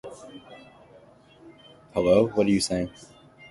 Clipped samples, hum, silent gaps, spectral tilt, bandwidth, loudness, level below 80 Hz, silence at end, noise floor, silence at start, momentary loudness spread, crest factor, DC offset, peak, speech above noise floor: under 0.1%; none; none; -5.5 dB/octave; 11.5 kHz; -24 LUFS; -54 dBFS; 0.6 s; -53 dBFS; 0.05 s; 24 LU; 22 dB; under 0.1%; -6 dBFS; 30 dB